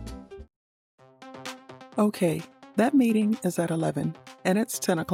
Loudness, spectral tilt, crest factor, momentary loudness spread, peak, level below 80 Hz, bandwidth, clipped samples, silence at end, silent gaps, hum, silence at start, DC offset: -26 LUFS; -5.5 dB/octave; 16 dB; 20 LU; -10 dBFS; -54 dBFS; 16.5 kHz; under 0.1%; 0 s; 0.56-0.98 s; none; 0 s; under 0.1%